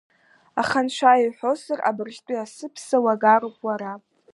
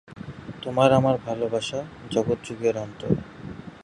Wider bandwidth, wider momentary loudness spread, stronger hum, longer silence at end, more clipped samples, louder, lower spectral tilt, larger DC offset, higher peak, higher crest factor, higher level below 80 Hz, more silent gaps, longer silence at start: about the same, 11.5 kHz vs 11.5 kHz; second, 16 LU vs 20 LU; neither; first, 0.35 s vs 0 s; neither; first, -22 LUFS vs -25 LUFS; second, -4 dB/octave vs -6.5 dB/octave; neither; about the same, -4 dBFS vs -4 dBFS; about the same, 20 dB vs 22 dB; second, -70 dBFS vs -52 dBFS; neither; first, 0.55 s vs 0.1 s